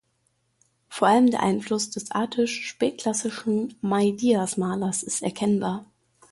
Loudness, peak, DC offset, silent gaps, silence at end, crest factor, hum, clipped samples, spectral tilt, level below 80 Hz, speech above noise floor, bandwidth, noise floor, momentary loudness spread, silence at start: -24 LUFS; -6 dBFS; under 0.1%; none; 0.45 s; 18 dB; none; under 0.1%; -4.5 dB/octave; -64 dBFS; 47 dB; 11.5 kHz; -71 dBFS; 8 LU; 0.9 s